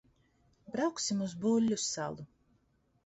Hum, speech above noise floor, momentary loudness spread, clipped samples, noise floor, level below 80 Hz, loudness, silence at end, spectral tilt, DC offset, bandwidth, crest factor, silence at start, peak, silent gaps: none; 40 dB; 12 LU; under 0.1%; -73 dBFS; -72 dBFS; -33 LUFS; 0.8 s; -4 dB/octave; under 0.1%; 8.2 kHz; 16 dB; 0.7 s; -20 dBFS; none